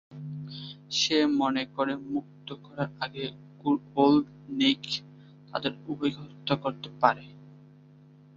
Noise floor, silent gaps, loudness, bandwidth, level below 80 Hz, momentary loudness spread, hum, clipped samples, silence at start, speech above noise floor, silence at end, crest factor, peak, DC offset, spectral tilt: -54 dBFS; none; -28 LUFS; 7.6 kHz; -68 dBFS; 16 LU; none; under 0.1%; 0.1 s; 26 dB; 0.8 s; 24 dB; -6 dBFS; under 0.1%; -4.5 dB/octave